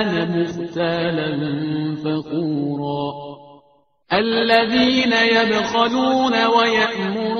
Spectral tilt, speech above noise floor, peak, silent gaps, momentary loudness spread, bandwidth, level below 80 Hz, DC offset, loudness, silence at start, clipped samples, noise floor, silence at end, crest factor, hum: -3 dB/octave; 39 dB; 0 dBFS; none; 9 LU; 6.6 kHz; -56 dBFS; under 0.1%; -18 LUFS; 0 s; under 0.1%; -58 dBFS; 0 s; 18 dB; none